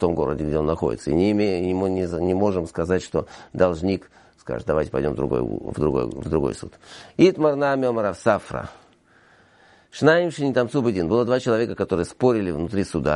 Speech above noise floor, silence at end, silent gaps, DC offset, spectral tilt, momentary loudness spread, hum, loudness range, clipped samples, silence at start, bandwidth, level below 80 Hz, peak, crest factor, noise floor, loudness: 34 dB; 0 s; none; under 0.1%; -7 dB/octave; 11 LU; none; 3 LU; under 0.1%; 0 s; 11.5 kHz; -44 dBFS; -4 dBFS; 18 dB; -56 dBFS; -22 LUFS